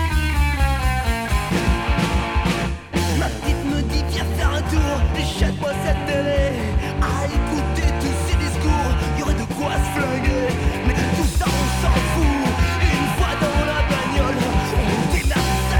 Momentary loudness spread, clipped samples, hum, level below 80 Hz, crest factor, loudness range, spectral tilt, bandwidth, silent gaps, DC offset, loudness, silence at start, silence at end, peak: 3 LU; under 0.1%; none; -22 dBFS; 14 dB; 2 LU; -5.5 dB/octave; 18.5 kHz; none; under 0.1%; -20 LUFS; 0 s; 0 s; -4 dBFS